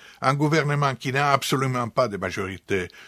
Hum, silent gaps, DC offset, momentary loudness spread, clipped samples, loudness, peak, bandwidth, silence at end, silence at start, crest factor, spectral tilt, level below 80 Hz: none; none; under 0.1%; 7 LU; under 0.1%; -23 LUFS; -2 dBFS; 15.5 kHz; 0 s; 0 s; 22 dB; -5.5 dB/octave; -54 dBFS